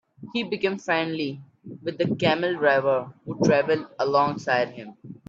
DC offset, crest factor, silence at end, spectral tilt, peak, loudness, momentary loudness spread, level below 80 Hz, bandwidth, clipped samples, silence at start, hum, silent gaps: under 0.1%; 18 dB; 0.15 s; -6 dB/octave; -6 dBFS; -24 LUFS; 14 LU; -66 dBFS; 7.6 kHz; under 0.1%; 0.2 s; none; none